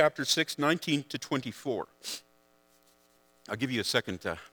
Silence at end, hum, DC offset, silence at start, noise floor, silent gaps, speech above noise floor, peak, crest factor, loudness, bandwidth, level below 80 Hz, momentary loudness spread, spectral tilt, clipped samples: 0.05 s; 60 Hz at -65 dBFS; under 0.1%; 0 s; -66 dBFS; none; 35 dB; -8 dBFS; 24 dB; -31 LUFS; over 20 kHz; -68 dBFS; 12 LU; -3.5 dB/octave; under 0.1%